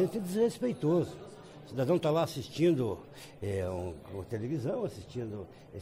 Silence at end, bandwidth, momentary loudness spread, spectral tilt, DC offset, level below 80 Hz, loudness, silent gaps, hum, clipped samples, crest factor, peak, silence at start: 0 s; 16 kHz; 16 LU; -7 dB/octave; under 0.1%; -62 dBFS; -33 LUFS; none; none; under 0.1%; 16 dB; -18 dBFS; 0 s